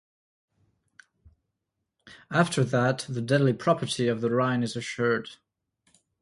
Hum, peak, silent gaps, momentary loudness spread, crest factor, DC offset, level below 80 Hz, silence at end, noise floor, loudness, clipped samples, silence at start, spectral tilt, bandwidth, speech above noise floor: none; -8 dBFS; none; 6 LU; 20 dB; under 0.1%; -66 dBFS; 0.85 s; -82 dBFS; -26 LUFS; under 0.1%; 2.05 s; -6 dB/octave; 11.5 kHz; 57 dB